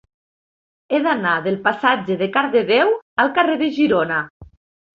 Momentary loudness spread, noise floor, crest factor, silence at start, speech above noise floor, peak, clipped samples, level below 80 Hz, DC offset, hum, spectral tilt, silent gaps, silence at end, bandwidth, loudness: 5 LU; under -90 dBFS; 18 dB; 0.9 s; over 72 dB; -2 dBFS; under 0.1%; -58 dBFS; under 0.1%; none; -7 dB/octave; 3.02-3.16 s, 4.30-4.40 s; 0.5 s; 6.8 kHz; -18 LUFS